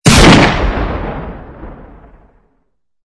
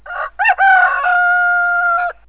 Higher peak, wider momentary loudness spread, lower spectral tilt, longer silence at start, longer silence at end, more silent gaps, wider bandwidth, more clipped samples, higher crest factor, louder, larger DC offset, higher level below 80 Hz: about the same, 0 dBFS vs -2 dBFS; first, 27 LU vs 6 LU; first, -4.5 dB/octave vs -3 dB/octave; about the same, 0.05 s vs 0.05 s; first, 1.2 s vs 0.15 s; neither; first, 11 kHz vs 4 kHz; first, 0.4% vs under 0.1%; about the same, 12 dB vs 12 dB; first, -9 LUFS vs -12 LUFS; second, under 0.1% vs 0.4%; first, -20 dBFS vs -50 dBFS